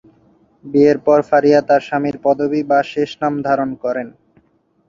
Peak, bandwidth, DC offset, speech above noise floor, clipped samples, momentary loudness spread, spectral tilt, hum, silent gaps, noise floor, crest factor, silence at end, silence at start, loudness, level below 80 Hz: -2 dBFS; 7.4 kHz; under 0.1%; 43 dB; under 0.1%; 9 LU; -7 dB/octave; none; none; -58 dBFS; 16 dB; 0.8 s; 0.65 s; -16 LUFS; -58 dBFS